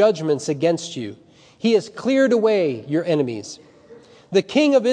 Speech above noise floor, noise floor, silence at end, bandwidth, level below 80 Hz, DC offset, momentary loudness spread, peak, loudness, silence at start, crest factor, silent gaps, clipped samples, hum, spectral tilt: 27 dB; -46 dBFS; 0 s; 10 kHz; -70 dBFS; under 0.1%; 15 LU; -4 dBFS; -20 LUFS; 0 s; 16 dB; none; under 0.1%; none; -5.5 dB/octave